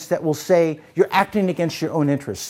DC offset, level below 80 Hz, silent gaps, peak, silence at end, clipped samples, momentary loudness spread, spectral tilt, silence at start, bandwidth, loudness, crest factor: under 0.1%; -60 dBFS; none; -2 dBFS; 0 s; under 0.1%; 5 LU; -5.5 dB/octave; 0 s; 16.5 kHz; -20 LUFS; 18 dB